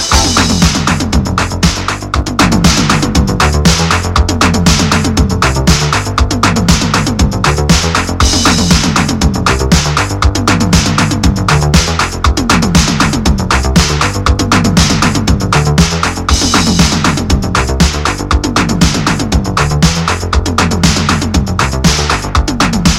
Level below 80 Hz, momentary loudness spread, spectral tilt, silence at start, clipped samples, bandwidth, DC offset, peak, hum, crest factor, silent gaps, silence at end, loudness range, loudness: -18 dBFS; 4 LU; -4 dB/octave; 0 s; 0.3%; 16.5 kHz; under 0.1%; 0 dBFS; none; 10 dB; none; 0 s; 1 LU; -10 LUFS